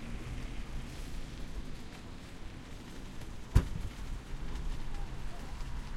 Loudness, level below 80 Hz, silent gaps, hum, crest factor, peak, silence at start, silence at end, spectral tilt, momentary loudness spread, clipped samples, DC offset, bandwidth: -42 LUFS; -40 dBFS; none; none; 26 dB; -10 dBFS; 0 s; 0 s; -6 dB/octave; 15 LU; under 0.1%; under 0.1%; 14.5 kHz